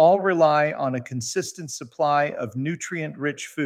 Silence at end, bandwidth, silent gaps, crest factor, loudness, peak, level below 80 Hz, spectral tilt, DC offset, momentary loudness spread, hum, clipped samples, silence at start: 0 s; 15.5 kHz; none; 18 dB; -23 LUFS; -6 dBFS; -70 dBFS; -5 dB/octave; under 0.1%; 11 LU; none; under 0.1%; 0 s